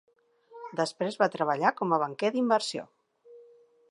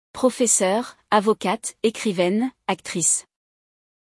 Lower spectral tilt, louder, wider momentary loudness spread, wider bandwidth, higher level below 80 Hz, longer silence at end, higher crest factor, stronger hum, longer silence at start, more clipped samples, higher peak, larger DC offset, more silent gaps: first, -4.5 dB/octave vs -3 dB/octave; second, -28 LUFS vs -21 LUFS; first, 11 LU vs 8 LU; about the same, 11.5 kHz vs 12 kHz; second, -84 dBFS vs -66 dBFS; second, 0.5 s vs 0.85 s; about the same, 20 dB vs 18 dB; neither; first, 0.5 s vs 0.15 s; neither; second, -10 dBFS vs -4 dBFS; neither; neither